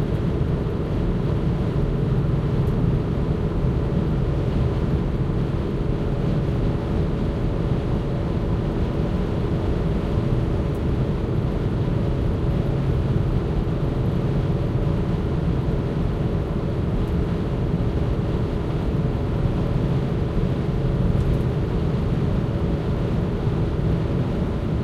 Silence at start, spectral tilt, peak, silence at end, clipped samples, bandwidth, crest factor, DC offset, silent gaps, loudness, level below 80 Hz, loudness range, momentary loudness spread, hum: 0 s; -9 dB/octave; -8 dBFS; 0 s; under 0.1%; 8.4 kHz; 14 dB; under 0.1%; none; -23 LUFS; -28 dBFS; 1 LU; 2 LU; none